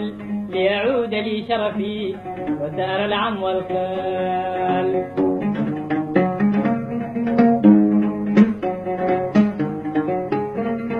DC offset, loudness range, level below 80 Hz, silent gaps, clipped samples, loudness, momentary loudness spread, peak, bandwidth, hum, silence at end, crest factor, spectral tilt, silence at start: under 0.1%; 5 LU; -54 dBFS; none; under 0.1%; -20 LUFS; 9 LU; -2 dBFS; 5.2 kHz; none; 0 s; 18 dB; -8.5 dB/octave; 0 s